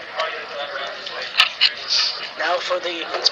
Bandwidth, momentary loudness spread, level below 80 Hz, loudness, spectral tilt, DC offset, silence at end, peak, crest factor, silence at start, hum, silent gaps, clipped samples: 13 kHz; 12 LU; -70 dBFS; -20 LUFS; 0.5 dB/octave; under 0.1%; 0 s; 0 dBFS; 22 dB; 0 s; none; none; under 0.1%